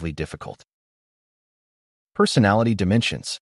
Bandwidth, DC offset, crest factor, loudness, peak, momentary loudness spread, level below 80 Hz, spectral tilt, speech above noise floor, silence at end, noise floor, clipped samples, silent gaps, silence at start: 11.5 kHz; under 0.1%; 20 dB; -20 LUFS; -4 dBFS; 18 LU; -48 dBFS; -5.5 dB/octave; over 69 dB; 0.05 s; under -90 dBFS; under 0.1%; 0.73-2.07 s; 0 s